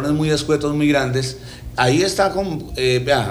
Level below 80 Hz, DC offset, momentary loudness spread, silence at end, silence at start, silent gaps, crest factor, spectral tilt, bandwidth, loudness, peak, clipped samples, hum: -38 dBFS; under 0.1%; 9 LU; 0 s; 0 s; none; 14 dB; -5 dB/octave; over 20 kHz; -19 LUFS; -6 dBFS; under 0.1%; 60 Hz at -40 dBFS